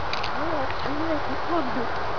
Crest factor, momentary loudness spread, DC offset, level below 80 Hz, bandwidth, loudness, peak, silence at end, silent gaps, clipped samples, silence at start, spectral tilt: 16 dB; 2 LU; 4%; -44 dBFS; 5.4 kHz; -27 LUFS; -12 dBFS; 0 s; none; under 0.1%; 0 s; -5.5 dB/octave